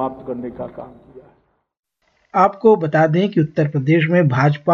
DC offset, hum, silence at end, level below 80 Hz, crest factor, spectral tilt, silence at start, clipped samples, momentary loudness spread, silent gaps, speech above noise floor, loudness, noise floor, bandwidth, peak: under 0.1%; none; 0 s; -58 dBFS; 16 dB; -9 dB/octave; 0 s; under 0.1%; 15 LU; 1.79-1.83 s; 47 dB; -16 LUFS; -64 dBFS; 6.8 kHz; -2 dBFS